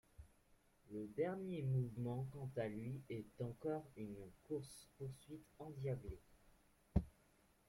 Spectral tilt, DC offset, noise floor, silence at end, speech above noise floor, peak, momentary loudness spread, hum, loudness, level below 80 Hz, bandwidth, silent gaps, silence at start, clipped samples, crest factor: -8 dB/octave; under 0.1%; -74 dBFS; 0.55 s; 28 dB; -22 dBFS; 15 LU; none; -47 LUFS; -60 dBFS; 15 kHz; none; 0.2 s; under 0.1%; 24 dB